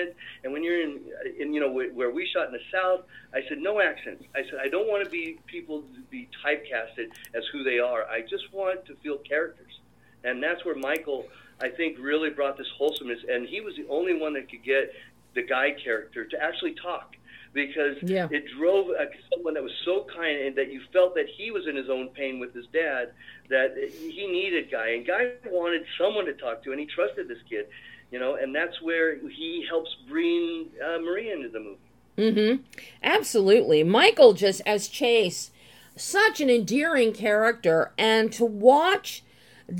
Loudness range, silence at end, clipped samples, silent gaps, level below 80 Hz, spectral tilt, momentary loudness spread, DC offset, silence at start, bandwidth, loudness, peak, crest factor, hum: 9 LU; 0 s; under 0.1%; none; -70 dBFS; -4 dB/octave; 14 LU; under 0.1%; 0 s; 17 kHz; -26 LUFS; -2 dBFS; 24 dB; none